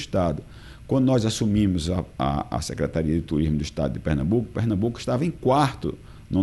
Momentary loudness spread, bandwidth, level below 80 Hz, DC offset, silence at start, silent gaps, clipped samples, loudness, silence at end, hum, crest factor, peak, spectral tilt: 8 LU; 12.5 kHz; -40 dBFS; under 0.1%; 0 s; none; under 0.1%; -24 LUFS; 0 s; none; 16 dB; -8 dBFS; -6.5 dB/octave